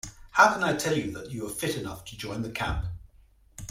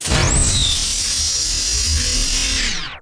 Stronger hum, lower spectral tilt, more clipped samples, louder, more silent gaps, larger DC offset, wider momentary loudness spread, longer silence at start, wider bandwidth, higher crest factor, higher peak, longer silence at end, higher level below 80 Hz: neither; first, -4 dB/octave vs -1.5 dB/octave; neither; second, -27 LUFS vs -16 LUFS; neither; neither; first, 17 LU vs 3 LU; about the same, 0.05 s vs 0 s; first, 16.5 kHz vs 11 kHz; first, 24 dB vs 16 dB; about the same, -4 dBFS vs -2 dBFS; about the same, 0 s vs 0 s; second, -44 dBFS vs -24 dBFS